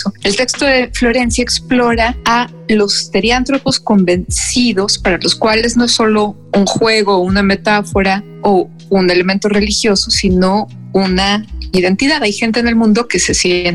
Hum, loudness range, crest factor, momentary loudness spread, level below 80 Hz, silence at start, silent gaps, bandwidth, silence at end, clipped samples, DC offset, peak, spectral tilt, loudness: none; 1 LU; 10 dB; 4 LU; -30 dBFS; 0 s; none; 12.5 kHz; 0 s; under 0.1%; under 0.1%; -2 dBFS; -4 dB/octave; -12 LUFS